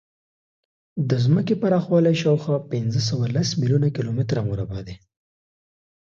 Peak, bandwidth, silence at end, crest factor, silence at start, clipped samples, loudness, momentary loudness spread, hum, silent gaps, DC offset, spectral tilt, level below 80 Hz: -6 dBFS; 7.6 kHz; 1.15 s; 16 dB; 0.95 s; under 0.1%; -22 LUFS; 10 LU; none; none; under 0.1%; -7 dB/octave; -52 dBFS